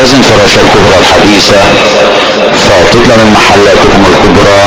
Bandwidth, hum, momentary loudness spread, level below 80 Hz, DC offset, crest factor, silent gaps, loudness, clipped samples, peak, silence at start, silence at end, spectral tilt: over 20 kHz; none; 2 LU; -22 dBFS; 1%; 2 dB; none; -3 LUFS; 10%; 0 dBFS; 0 s; 0 s; -4 dB/octave